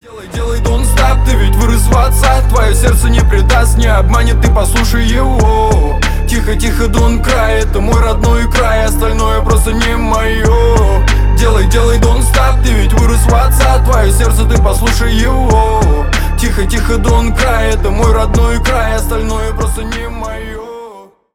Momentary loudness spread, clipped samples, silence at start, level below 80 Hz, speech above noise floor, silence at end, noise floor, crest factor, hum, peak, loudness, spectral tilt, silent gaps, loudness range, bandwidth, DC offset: 6 LU; under 0.1%; 0.1 s; -10 dBFS; 25 dB; 0.35 s; -34 dBFS; 8 dB; none; 0 dBFS; -11 LUFS; -5 dB/octave; none; 2 LU; 16 kHz; under 0.1%